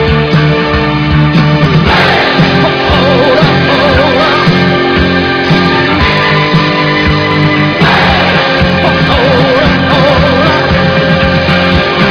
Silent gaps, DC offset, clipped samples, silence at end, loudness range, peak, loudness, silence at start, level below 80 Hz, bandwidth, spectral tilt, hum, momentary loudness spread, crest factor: none; under 0.1%; 1%; 0 s; 1 LU; 0 dBFS; -7 LUFS; 0 s; -24 dBFS; 5.4 kHz; -6.5 dB/octave; none; 2 LU; 8 dB